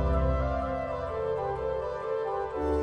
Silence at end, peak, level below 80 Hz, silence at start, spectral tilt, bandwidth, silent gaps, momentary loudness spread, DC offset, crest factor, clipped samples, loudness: 0 s; -16 dBFS; -36 dBFS; 0 s; -8.5 dB/octave; 6.4 kHz; none; 5 LU; under 0.1%; 14 dB; under 0.1%; -31 LUFS